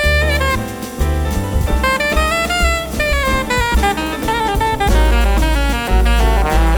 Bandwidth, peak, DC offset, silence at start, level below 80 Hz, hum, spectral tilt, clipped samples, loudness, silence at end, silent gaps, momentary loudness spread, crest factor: 19 kHz; -2 dBFS; under 0.1%; 0 s; -16 dBFS; none; -4.5 dB/octave; under 0.1%; -16 LUFS; 0 s; none; 5 LU; 12 dB